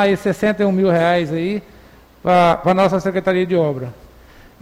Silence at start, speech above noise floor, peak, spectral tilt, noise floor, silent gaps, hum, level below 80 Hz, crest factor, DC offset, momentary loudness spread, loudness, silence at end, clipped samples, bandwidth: 0 s; 29 dB; -4 dBFS; -7 dB/octave; -45 dBFS; none; none; -48 dBFS; 12 dB; under 0.1%; 11 LU; -17 LUFS; 0.7 s; under 0.1%; 15.5 kHz